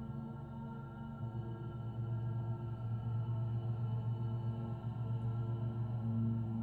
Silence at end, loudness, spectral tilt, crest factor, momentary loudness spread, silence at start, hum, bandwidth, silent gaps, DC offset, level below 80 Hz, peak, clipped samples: 0 s; -40 LUFS; -11 dB/octave; 12 dB; 9 LU; 0 s; none; 3.3 kHz; none; under 0.1%; -58 dBFS; -28 dBFS; under 0.1%